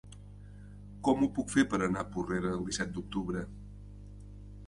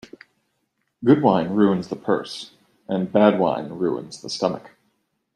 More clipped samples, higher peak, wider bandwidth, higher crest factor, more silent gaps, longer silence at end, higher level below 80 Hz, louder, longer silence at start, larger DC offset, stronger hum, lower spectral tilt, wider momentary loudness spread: neither; second, -12 dBFS vs -2 dBFS; about the same, 11.5 kHz vs 11.5 kHz; about the same, 22 dB vs 20 dB; neither; second, 0 s vs 0.7 s; first, -50 dBFS vs -64 dBFS; second, -32 LUFS vs -21 LUFS; second, 0.05 s vs 1 s; neither; first, 50 Hz at -45 dBFS vs none; about the same, -5.5 dB/octave vs -6.5 dB/octave; first, 22 LU vs 15 LU